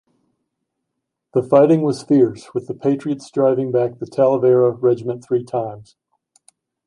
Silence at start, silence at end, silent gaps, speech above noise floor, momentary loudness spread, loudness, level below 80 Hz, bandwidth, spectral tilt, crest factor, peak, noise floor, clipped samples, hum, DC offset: 1.35 s; 1.05 s; none; 61 dB; 10 LU; -18 LUFS; -64 dBFS; 11 kHz; -8.5 dB/octave; 18 dB; 0 dBFS; -78 dBFS; under 0.1%; none; under 0.1%